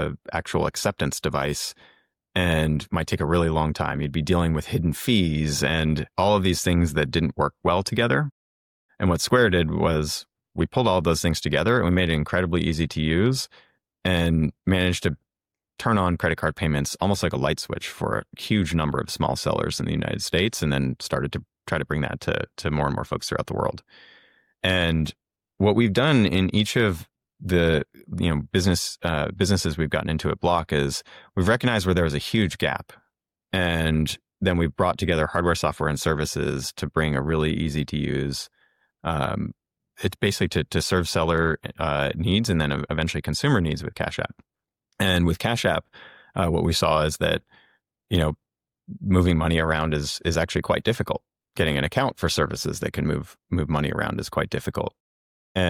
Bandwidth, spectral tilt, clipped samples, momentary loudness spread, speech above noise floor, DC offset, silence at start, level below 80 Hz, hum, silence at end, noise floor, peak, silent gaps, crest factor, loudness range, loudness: 16.5 kHz; -5 dB/octave; under 0.1%; 8 LU; over 67 dB; under 0.1%; 0 s; -40 dBFS; none; 0 s; under -90 dBFS; -6 dBFS; 8.32-8.89 s, 55.00-55.55 s; 16 dB; 4 LU; -24 LUFS